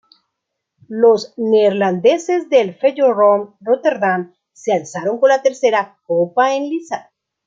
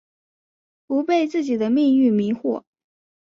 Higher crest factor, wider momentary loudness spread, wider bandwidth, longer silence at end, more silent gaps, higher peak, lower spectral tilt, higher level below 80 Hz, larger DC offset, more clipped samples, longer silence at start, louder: about the same, 14 dB vs 14 dB; about the same, 9 LU vs 9 LU; about the same, 7.6 kHz vs 7.2 kHz; second, 0.45 s vs 0.65 s; neither; first, -2 dBFS vs -8 dBFS; second, -5 dB/octave vs -7 dB/octave; about the same, -68 dBFS vs -68 dBFS; neither; neither; about the same, 0.9 s vs 0.9 s; first, -16 LUFS vs -20 LUFS